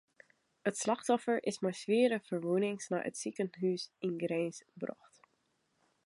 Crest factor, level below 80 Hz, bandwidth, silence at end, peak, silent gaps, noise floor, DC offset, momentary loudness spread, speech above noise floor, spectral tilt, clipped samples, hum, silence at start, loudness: 18 dB; -86 dBFS; 11.5 kHz; 1.15 s; -16 dBFS; none; -78 dBFS; under 0.1%; 9 LU; 44 dB; -5 dB/octave; under 0.1%; none; 0.65 s; -35 LUFS